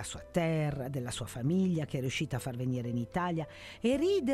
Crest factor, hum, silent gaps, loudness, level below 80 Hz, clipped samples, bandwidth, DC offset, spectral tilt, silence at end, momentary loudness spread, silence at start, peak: 16 dB; none; none; -33 LUFS; -56 dBFS; under 0.1%; 14.5 kHz; under 0.1%; -6 dB/octave; 0 s; 7 LU; 0 s; -16 dBFS